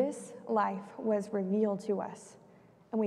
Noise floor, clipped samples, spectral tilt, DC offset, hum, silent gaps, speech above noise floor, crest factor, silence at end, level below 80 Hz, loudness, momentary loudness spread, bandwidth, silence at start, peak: -60 dBFS; under 0.1%; -7 dB/octave; under 0.1%; none; none; 27 dB; 16 dB; 0 s; -80 dBFS; -33 LUFS; 13 LU; 12 kHz; 0 s; -18 dBFS